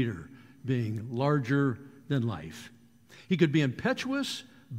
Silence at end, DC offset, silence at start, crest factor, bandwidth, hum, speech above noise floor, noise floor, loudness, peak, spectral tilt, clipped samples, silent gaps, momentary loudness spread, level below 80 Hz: 0 s; under 0.1%; 0 s; 20 dB; 15 kHz; none; 27 dB; -56 dBFS; -30 LUFS; -10 dBFS; -6.5 dB/octave; under 0.1%; none; 17 LU; -64 dBFS